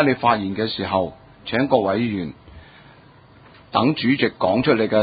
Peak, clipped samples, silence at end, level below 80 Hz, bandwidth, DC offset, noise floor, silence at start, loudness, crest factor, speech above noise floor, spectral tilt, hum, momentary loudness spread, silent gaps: -2 dBFS; under 0.1%; 0 s; -50 dBFS; 5 kHz; under 0.1%; -48 dBFS; 0 s; -20 LUFS; 20 dB; 29 dB; -11 dB/octave; none; 9 LU; none